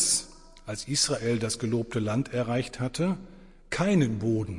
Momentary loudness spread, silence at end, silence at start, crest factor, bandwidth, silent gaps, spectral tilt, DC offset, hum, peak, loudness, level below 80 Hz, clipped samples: 12 LU; 0 s; 0 s; 16 dB; 11.5 kHz; none; -4 dB/octave; under 0.1%; none; -12 dBFS; -28 LUFS; -52 dBFS; under 0.1%